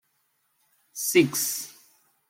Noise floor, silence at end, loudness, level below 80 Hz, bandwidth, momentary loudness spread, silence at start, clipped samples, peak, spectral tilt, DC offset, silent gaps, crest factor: -72 dBFS; 0.6 s; -24 LUFS; -74 dBFS; 16.5 kHz; 20 LU; 0.95 s; under 0.1%; -8 dBFS; -3 dB/octave; under 0.1%; none; 22 dB